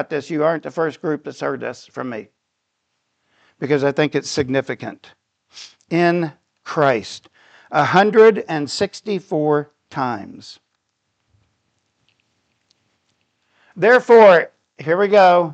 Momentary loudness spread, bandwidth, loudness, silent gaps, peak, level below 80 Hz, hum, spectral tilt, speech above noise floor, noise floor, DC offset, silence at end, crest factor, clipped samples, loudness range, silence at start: 19 LU; 8.8 kHz; -17 LUFS; none; -2 dBFS; -64 dBFS; none; -5.5 dB/octave; 58 dB; -74 dBFS; under 0.1%; 0 s; 18 dB; under 0.1%; 10 LU; 0 s